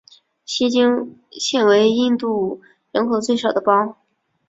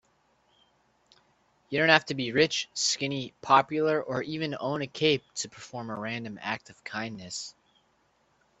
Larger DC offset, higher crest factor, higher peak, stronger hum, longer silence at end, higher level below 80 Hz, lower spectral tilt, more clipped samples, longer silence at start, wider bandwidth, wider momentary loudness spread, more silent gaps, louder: neither; second, 18 dB vs 28 dB; about the same, -2 dBFS vs -2 dBFS; neither; second, 0.55 s vs 1.1 s; first, -64 dBFS vs -70 dBFS; about the same, -4 dB/octave vs -3.5 dB/octave; neither; second, 0.5 s vs 1.7 s; about the same, 7.8 kHz vs 8.4 kHz; second, 12 LU vs 15 LU; neither; first, -18 LUFS vs -28 LUFS